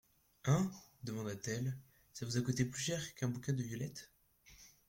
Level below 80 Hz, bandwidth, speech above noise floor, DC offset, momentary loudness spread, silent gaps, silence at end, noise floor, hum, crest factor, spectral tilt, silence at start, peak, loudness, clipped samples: -68 dBFS; 16.5 kHz; 26 dB; under 0.1%; 16 LU; none; 0.2 s; -64 dBFS; none; 20 dB; -5 dB/octave; 0.45 s; -20 dBFS; -40 LUFS; under 0.1%